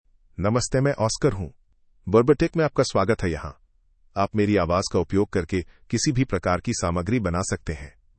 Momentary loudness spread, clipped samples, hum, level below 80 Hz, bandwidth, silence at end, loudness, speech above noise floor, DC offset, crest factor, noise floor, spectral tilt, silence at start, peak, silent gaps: 13 LU; under 0.1%; none; -44 dBFS; 8.8 kHz; 0.3 s; -23 LUFS; 37 dB; under 0.1%; 20 dB; -60 dBFS; -5.5 dB/octave; 0.4 s; -4 dBFS; none